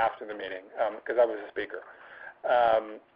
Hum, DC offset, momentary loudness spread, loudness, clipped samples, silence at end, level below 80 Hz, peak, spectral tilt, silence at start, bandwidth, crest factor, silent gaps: none; under 0.1%; 19 LU; -29 LUFS; under 0.1%; 0.15 s; -68 dBFS; -12 dBFS; -7.5 dB/octave; 0 s; 5.2 kHz; 18 dB; none